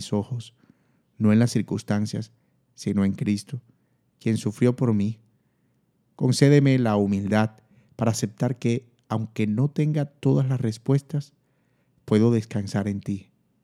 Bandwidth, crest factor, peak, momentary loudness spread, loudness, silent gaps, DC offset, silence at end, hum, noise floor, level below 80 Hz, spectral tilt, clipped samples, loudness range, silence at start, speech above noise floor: 13 kHz; 22 dB; -2 dBFS; 12 LU; -24 LUFS; none; under 0.1%; 0.45 s; none; -68 dBFS; -68 dBFS; -7 dB/octave; under 0.1%; 4 LU; 0 s; 45 dB